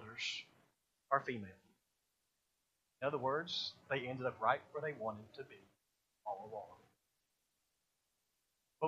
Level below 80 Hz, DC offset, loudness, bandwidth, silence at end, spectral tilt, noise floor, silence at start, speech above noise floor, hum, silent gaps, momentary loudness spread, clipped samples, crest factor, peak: -86 dBFS; under 0.1%; -41 LUFS; 14.5 kHz; 0 s; -4.5 dB/octave; -85 dBFS; 0 s; 44 dB; none; none; 17 LU; under 0.1%; 26 dB; -18 dBFS